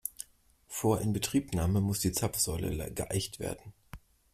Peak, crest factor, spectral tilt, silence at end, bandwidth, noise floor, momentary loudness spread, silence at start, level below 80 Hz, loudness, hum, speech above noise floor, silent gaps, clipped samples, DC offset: -14 dBFS; 20 dB; -5 dB/octave; 0.35 s; 16 kHz; -62 dBFS; 14 LU; 0.05 s; -50 dBFS; -32 LUFS; none; 31 dB; none; under 0.1%; under 0.1%